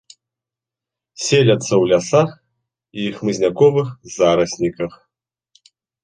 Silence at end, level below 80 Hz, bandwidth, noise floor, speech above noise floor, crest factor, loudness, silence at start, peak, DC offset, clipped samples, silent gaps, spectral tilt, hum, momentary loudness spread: 1.15 s; -54 dBFS; 10 kHz; -87 dBFS; 71 dB; 18 dB; -17 LUFS; 1.2 s; -2 dBFS; under 0.1%; under 0.1%; none; -5 dB/octave; none; 12 LU